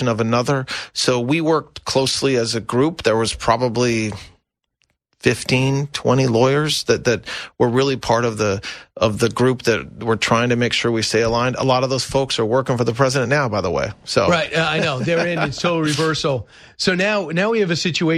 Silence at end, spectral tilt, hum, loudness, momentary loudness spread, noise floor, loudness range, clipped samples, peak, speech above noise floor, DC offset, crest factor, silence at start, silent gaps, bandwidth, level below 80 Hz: 0 s; -4.5 dB/octave; none; -18 LUFS; 5 LU; -69 dBFS; 2 LU; under 0.1%; 0 dBFS; 50 dB; under 0.1%; 18 dB; 0 s; none; 13.5 kHz; -46 dBFS